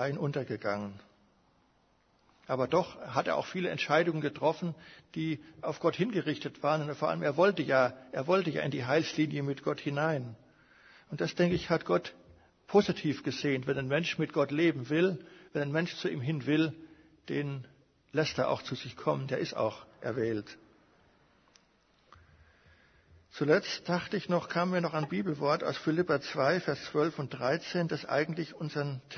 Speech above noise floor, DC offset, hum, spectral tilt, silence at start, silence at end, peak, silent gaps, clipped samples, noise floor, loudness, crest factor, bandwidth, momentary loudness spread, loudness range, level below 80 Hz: 38 dB; under 0.1%; none; -6.5 dB/octave; 0 s; 0 s; -10 dBFS; none; under 0.1%; -69 dBFS; -32 LUFS; 22 dB; 6.6 kHz; 9 LU; 6 LU; -68 dBFS